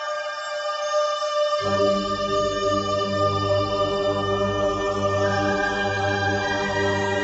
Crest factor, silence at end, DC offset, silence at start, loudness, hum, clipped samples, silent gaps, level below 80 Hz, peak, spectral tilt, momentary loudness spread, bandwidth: 14 dB; 0 s; under 0.1%; 0 s; -23 LUFS; none; under 0.1%; none; -46 dBFS; -10 dBFS; -4.5 dB/octave; 2 LU; 8.2 kHz